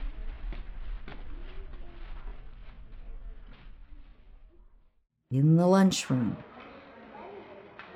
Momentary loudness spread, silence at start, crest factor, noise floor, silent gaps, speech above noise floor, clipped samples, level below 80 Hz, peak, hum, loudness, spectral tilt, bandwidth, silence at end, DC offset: 27 LU; 0 s; 20 dB; -57 dBFS; none; 33 dB; under 0.1%; -42 dBFS; -10 dBFS; none; -25 LUFS; -6.5 dB/octave; 13.5 kHz; 0 s; under 0.1%